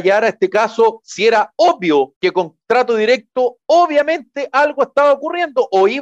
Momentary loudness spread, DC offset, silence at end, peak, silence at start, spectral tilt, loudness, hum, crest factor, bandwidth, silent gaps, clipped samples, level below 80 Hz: 5 LU; under 0.1%; 0 s; -4 dBFS; 0 s; -4 dB/octave; -15 LUFS; none; 12 dB; 8.4 kHz; 2.16-2.21 s; under 0.1%; -68 dBFS